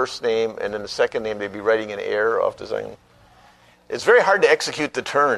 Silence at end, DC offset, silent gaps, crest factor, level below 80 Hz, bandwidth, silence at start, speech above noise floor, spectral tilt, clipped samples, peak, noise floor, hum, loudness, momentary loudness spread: 0 s; under 0.1%; none; 18 dB; -58 dBFS; 12.5 kHz; 0 s; 32 dB; -3 dB/octave; under 0.1%; -2 dBFS; -53 dBFS; 60 Hz at -60 dBFS; -21 LUFS; 13 LU